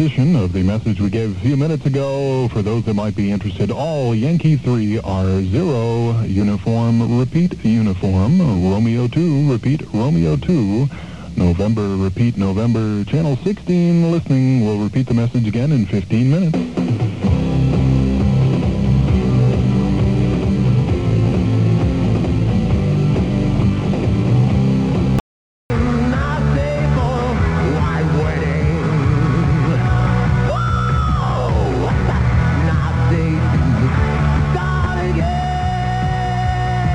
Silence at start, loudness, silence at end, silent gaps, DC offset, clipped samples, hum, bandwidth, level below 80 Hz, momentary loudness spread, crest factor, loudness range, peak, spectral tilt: 0 s; -17 LUFS; 0 s; 25.20-25.69 s; 0.6%; under 0.1%; none; 9.4 kHz; -26 dBFS; 4 LU; 12 dB; 2 LU; -4 dBFS; -8.5 dB/octave